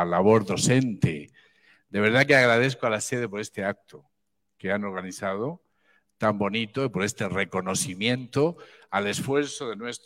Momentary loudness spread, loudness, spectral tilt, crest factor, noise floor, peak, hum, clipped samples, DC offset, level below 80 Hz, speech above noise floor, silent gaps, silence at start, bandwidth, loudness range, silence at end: 13 LU; -25 LUFS; -4.5 dB/octave; 20 dB; -78 dBFS; -6 dBFS; none; under 0.1%; under 0.1%; -62 dBFS; 53 dB; none; 0 s; 16 kHz; 8 LU; 0.1 s